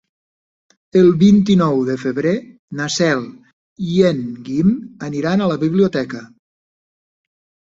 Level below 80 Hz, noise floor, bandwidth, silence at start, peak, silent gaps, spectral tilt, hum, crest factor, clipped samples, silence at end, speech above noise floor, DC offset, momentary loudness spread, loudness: -52 dBFS; under -90 dBFS; 7.8 kHz; 0.95 s; -2 dBFS; 2.59-2.68 s, 3.53-3.76 s; -6.5 dB/octave; none; 16 dB; under 0.1%; 1.45 s; over 74 dB; under 0.1%; 14 LU; -16 LUFS